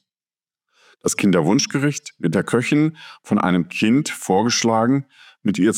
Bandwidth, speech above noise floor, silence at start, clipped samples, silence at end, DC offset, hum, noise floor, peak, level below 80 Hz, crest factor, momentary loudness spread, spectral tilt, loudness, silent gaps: 16 kHz; over 71 dB; 1.05 s; under 0.1%; 0 s; under 0.1%; none; under -90 dBFS; -4 dBFS; -66 dBFS; 16 dB; 7 LU; -5 dB/octave; -19 LUFS; none